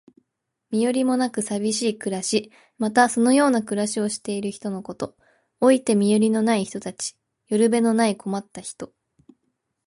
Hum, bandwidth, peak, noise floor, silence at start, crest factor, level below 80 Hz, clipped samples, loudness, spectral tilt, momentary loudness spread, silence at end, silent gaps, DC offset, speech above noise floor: none; 11.5 kHz; -4 dBFS; -77 dBFS; 0.7 s; 18 dB; -66 dBFS; under 0.1%; -22 LUFS; -4.5 dB/octave; 14 LU; 1 s; none; under 0.1%; 56 dB